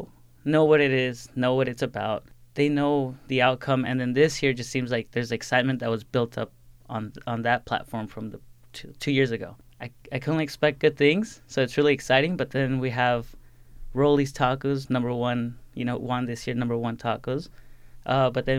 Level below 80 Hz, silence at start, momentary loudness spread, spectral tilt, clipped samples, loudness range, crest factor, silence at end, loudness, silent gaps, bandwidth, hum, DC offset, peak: -50 dBFS; 0 s; 13 LU; -6 dB/octave; under 0.1%; 5 LU; 20 dB; 0 s; -25 LUFS; none; 15 kHz; none; under 0.1%; -6 dBFS